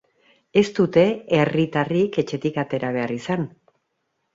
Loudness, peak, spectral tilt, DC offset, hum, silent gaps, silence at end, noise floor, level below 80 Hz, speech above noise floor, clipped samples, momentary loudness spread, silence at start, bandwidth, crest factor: -21 LUFS; -4 dBFS; -7 dB/octave; under 0.1%; none; none; 0.85 s; -74 dBFS; -60 dBFS; 53 dB; under 0.1%; 7 LU; 0.55 s; 7.8 kHz; 18 dB